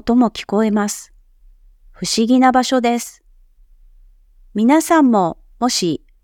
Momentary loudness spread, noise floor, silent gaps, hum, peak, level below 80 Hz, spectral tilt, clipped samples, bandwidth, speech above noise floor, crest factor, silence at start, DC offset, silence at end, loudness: 11 LU; -49 dBFS; none; none; 0 dBFS; -48 dBFS; -4 dB/octave; under 0.1%; 17.5 kHz; 34 dB; 18 dB; 0.05 s; under 0.1%; 0.3 s; -16 LUFS